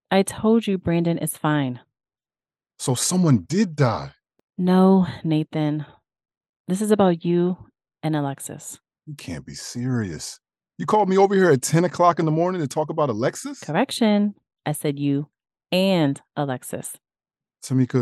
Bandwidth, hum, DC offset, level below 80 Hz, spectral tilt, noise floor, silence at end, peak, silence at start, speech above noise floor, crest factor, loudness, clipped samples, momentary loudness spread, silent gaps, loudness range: 12.5 kHz; none; under 0.1%; -60 dBFS; -6 dB/octave; under -90 dBFS; 0 s; -4 dBFS; 0.1 s; over 69 dB; 18 dB; -22 LUFS; under 0.1%; 17 LU; 4.44-4.48 s, 6.37-6.41 s, 6.49-6.65 s; 5 LU